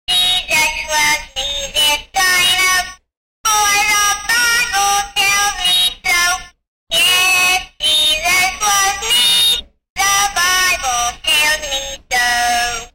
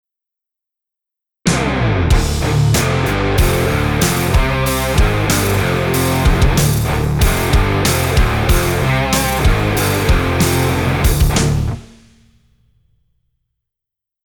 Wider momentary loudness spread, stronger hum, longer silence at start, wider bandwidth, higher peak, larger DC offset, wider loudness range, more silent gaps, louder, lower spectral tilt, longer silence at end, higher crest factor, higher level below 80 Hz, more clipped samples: first, 7 LU vs 2 LU; neither; second, 0.1 s vs 1.45 s; second, 16 kHz vs over 20 kHz; about the same, -4 dBFS vs -4 dBFS; neither; about the same, 2 LU vs 3 LU; first, 3.17-3.44 s, 6.68-6.87 s, 9.90-9.96 s vs none; about the same, -13 LUFS vs -15 LUFS; second, 1.5 dB/octave vs -5 dB/octave; second, 0.05 s vs 2.4 s; about the same, 10 dB vs 12 dB; second, -40 dBFS vs -20 dBFS; neither